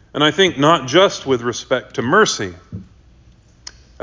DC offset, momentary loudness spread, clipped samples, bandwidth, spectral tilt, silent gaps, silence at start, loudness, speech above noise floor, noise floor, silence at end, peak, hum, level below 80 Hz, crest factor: under 0.1%; 17 LU; under 0.1%; 7.6 kHz; -4 dB/octave; none; 0.15 s; -16 LUFS; 32 dB; -48 dBFS; 1.2 s; -2 dBFS; none; -48 dBFS; 16 dB